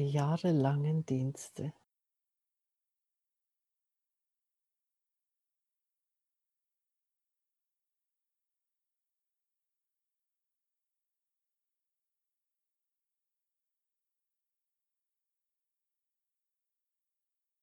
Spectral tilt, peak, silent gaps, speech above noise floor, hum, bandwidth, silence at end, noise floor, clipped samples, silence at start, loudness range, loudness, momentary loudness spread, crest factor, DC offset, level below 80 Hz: -7.5 dB/octave; -16 dBFS; none; 57 dB; none; 12 kHz; 15.9 s; -89 dBFS; under 0.1%; 0 s; 16 LU; -33 LUFS; 13 LU; 26 dB; under 0.1%; -84 dBFS